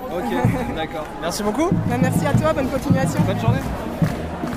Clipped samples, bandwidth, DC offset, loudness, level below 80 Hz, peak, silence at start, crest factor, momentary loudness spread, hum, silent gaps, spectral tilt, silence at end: under 0.1%; 16 kHz; under 0.1%; -21 LUFS; -36 dBFS; -4 dBFS; 0 s; 16 dB; 8 LU; none; none; -6.5 dB/octave; 0 s